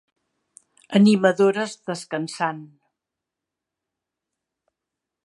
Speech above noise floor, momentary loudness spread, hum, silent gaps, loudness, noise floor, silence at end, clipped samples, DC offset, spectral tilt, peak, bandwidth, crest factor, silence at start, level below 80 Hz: 65 dB; 13 LU; none; none; -21 LUFS; -85 dBFS; 2.6 s; under 0.1%; under 0.1%; -6 dB/octave; -2 dBFS; 11.5 kHz; 22 dB; 0.9 s; -74 dBFS